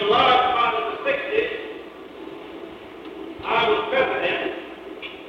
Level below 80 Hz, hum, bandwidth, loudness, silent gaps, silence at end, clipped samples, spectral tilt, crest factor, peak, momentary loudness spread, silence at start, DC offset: -58 dBFS; none; 8.8 kHz; -21 LUFS; none; 0 s; under 0.1%; -5 dB/octave; 18 dB; -6 dBFS; 21 LU; 0 s; under 0.1%